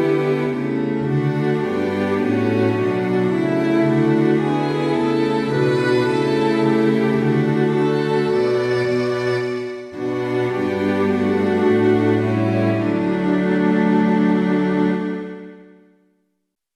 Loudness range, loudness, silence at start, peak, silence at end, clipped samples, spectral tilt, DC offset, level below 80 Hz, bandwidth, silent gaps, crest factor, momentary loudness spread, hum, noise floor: 2 LU; -19 LUFS; 0 s; -6 dBFS; 1.2 s; under 0.1%; -8 dB/octave; under 0.1%; -56 dBFS; 12 kHz; none; 14 dB; 5 LU; none; -73 dBFS